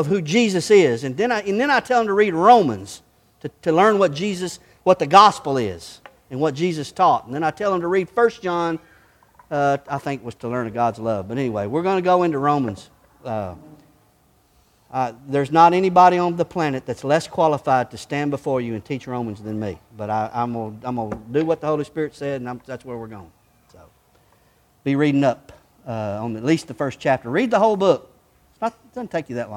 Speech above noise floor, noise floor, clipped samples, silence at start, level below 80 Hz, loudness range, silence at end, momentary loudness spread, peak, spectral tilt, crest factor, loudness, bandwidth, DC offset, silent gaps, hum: 39 dB; -59 dBFS; under 0.1%; 0 s; -58 dBFS; 8 LU; 0 s; 16 LU; 0 dBFS; -6 dB/octave; 20 dB; -20 LUFS; 15.5 kHz; under 0.1%; none; none